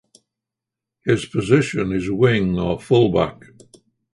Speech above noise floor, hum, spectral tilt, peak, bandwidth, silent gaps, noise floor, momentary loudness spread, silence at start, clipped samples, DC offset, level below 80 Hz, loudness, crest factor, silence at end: 67 dB; none; -7 dB/octave; -2 dBFS; 11.5 kHz; none; -86 dBFS; 6 LU; 1.05 s; under 0.1%; under 0.1%; -44 dBFS; -19 LUFS; 20 dB; 0.8 s